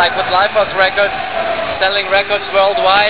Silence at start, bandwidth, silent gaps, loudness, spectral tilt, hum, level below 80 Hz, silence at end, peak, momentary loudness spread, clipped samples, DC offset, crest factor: 0 s; 4 kHz; none; -13 LUFS; -6.5 dB/octave; none; -44 dBFS; 0 s; 0 dBFS; 6 LU; under 0.1%; 1%; 14 dB